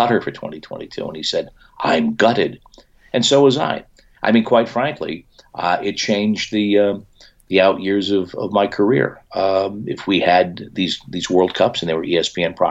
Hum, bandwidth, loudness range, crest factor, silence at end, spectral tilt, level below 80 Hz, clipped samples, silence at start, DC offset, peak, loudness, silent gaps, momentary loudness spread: none; 8.2 kHz; 2 LU; 16 dB; 0 s; -4.5 dB/octave; -54 dBFS; under 0.1%; 0 s; under 0.1%; -2 dBFS; -18 LUFS; none; 13 LU